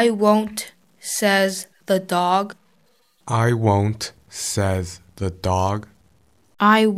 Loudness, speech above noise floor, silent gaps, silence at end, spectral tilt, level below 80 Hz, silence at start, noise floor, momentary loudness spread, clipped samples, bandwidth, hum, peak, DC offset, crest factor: -21 LUFS; 43 dB; none; 0 s; -5 dB/octave; -50 dBFS; 0 s; -62 dBFS; 13 LU; under 0.1%; 16 kHz; none; -2 dBFS; under 0.1%; 18 dB